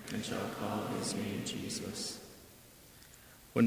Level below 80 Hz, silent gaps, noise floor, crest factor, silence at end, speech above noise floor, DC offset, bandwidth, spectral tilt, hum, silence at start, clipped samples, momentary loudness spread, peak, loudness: -64 dBFS; none; -57 dBFS; 22 dB; 0 s; 19 dB; under 0.1%; 16 kHz; -4.5 dB/octave; none; 0 s; under 0.1%; 19 LU; -16 dBFS; -38 LUFS